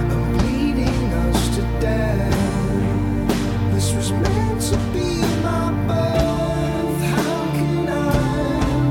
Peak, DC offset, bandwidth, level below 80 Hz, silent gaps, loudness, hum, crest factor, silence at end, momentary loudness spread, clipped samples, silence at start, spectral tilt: -6 dBFS; under 0.1%; 17 kHz; -28 dBFS; none; -20 LUFS; none; 14 dB; 0 s; 2 LU; under 0.1%; 0 s; -6 dB/octave